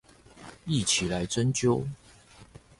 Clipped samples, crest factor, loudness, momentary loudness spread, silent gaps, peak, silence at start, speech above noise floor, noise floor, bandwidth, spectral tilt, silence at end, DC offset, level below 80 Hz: under 0.1%; 18 dB; -27 LUFS; 23 LU; none; -12 dBFS; 0.35 s; 27 dB; -54 dBFS; 11.5 kHz; -4 dB/octave; 0.35 s; under 0.1%; -52 dBFS